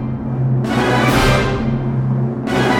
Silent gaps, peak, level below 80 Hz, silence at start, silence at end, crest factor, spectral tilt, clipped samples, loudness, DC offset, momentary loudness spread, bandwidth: none; -2 dBFS; -30 dBFS; 0 s; 0 s; 14 dB; -6 dB/octave; under 0.1%; -16 LUFS; under 0.1%; 6 LU; 17 kHz